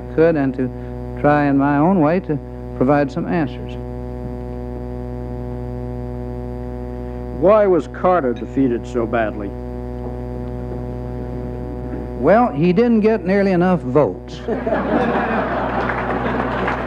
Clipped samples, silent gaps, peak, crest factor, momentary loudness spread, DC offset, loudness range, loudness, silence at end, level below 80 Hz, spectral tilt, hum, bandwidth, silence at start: under 0.1%; none; -2 dBFS; 16 dB; 14 LU; under 0.1%; 9 LU; -19 LUFS; 0 s; -34 dBFS; -9 dB/octave; none; 8.4 kHz; 0 s